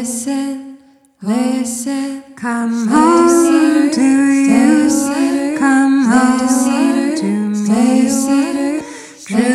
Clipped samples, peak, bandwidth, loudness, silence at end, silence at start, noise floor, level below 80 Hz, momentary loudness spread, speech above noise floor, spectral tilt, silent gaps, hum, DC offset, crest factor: under 0.1%; 0 dBFS; 14.5 kHz; -13 LUFS; 0 s; 0 s; -42 dBFS; -54 dBFS; 11 LU; 29 dB; -4.5 dB/octave; none; none; under 0.1%; 12 dB